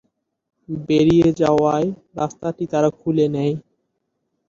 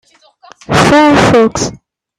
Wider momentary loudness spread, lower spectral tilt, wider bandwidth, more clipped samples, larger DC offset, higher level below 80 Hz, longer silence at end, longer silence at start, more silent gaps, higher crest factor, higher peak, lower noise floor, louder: about the same, 12 LU vs 11 LU; first, -7.5 dB/octave vs -5 dB/octave; second, 7.6 kHz vs 13.5 kHz; neither; neither; second, -50 dBFS vs -36 dBFS; first, 0.9 s vs 0.45 s; about the same, 0.7 s vs 0.7 s; neither; first, 16 dB vs 10 dB; second, -4 dBFS vs 0 dBFS; first, -74 dBFS vs -42 dBFS; second, -19 LUFS vs -9 LUFS